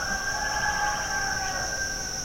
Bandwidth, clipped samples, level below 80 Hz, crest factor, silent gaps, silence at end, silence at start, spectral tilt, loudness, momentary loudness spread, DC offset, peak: 16.5 kHz; under 0.1%; -42 dBFS; 14 dB; none; 0 s; 0 s; -1 dB/octave; -27 LUFS; 3 LU; under 0.1%; -14 dBFS